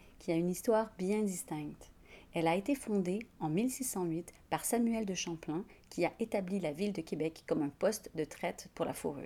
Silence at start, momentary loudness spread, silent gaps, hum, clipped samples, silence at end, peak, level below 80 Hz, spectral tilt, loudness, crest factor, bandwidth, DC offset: 0.05 s; 9 LU; none; none; under 0.1%; 0 s; -18 dBFS; -64 dBFS; -5 dB/octave; -36 LUFS; 18 dB; 19.5 kHz; under 0.1%